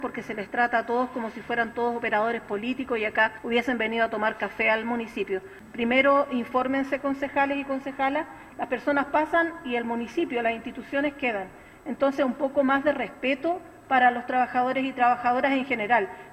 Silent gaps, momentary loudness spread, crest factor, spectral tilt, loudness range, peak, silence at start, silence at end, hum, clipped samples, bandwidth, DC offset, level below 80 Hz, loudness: none; 9 LU; 18 dB; -5.5 dB/octave; 3 LU; -8 dBFS; 0 s; 0 s; none; under 0.1%; 14.5 kHz; under 0.1%; -60 dBFS; -26 LUFS